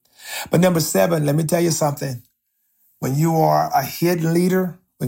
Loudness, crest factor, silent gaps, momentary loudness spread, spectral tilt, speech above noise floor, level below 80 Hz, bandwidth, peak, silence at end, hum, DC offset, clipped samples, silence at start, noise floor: -19 LUFS; 16 dB; none; 12 LU; -5.5 dB/octave; 51 dB; -58 dBFS; 16.5 kHz; -4 dBFS; 0 s; none; under 0.1%; under 0.1%; 0.2 s; -69 dBFS